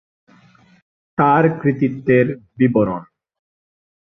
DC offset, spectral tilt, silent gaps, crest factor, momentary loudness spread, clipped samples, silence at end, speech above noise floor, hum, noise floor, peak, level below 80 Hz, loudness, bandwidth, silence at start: under 0.1%; -10.5 dB/octave; none; 18 dB; 8 LU; under 0.1%; 1.1 s; 35 dB; none; -51 dBFS; -2 dBFS; -56 dBFS; -17 LUFS; 3.9 kHz; 1.2 s